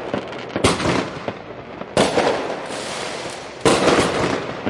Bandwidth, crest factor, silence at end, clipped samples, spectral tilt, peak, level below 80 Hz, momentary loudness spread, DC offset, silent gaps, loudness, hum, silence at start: 11.5 kHz; 20 dB; 0 s; under 0.1%; -4 dB/octave; -2 dBFS; -46 dBFS; 14 LU; under 0.1%; none; -20 LUFS; none; 0 s